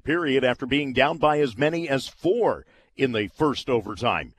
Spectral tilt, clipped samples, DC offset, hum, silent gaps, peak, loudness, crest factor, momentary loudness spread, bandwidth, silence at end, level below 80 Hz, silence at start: -5.5 dB/octave; under 0.1%; under 0.1%; none; none; -4 dBFS; -24 LUFS; 20 dB; 5 LU; 13 kHz; 0.1 s; -52 dBFS; 0.05 s